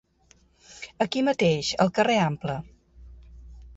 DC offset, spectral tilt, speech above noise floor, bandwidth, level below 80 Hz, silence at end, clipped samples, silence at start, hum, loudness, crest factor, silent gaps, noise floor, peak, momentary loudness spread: under 0.1%; -5 dB/octave; 37 dB; 8 kHz; -52 dBFS; 0.05 s; under 0.1%; 0.7 s; none; -24 LUFS; 20 dB; none; -61 dBFS; -8 dBFS; 14 LU